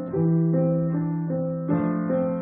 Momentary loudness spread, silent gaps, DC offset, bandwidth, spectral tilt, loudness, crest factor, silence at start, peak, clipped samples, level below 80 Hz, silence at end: 5 LU; none; under 0.1%; 2.5 kHz; -12.5 dB/octave; -24 LUFS; 12 dB; 0 s; -12 dBFS; under 0.1%; -60 dBFS; 0 s